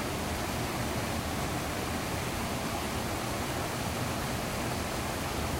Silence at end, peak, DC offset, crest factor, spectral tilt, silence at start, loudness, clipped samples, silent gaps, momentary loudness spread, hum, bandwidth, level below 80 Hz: 0 s; -20 dBFS; under 0.1%; 14 dB; -4 dB/octave; 0 s; -33 LUFS; under 0.1%; none; 1 LU; none; 16 kHz; -44 dBFS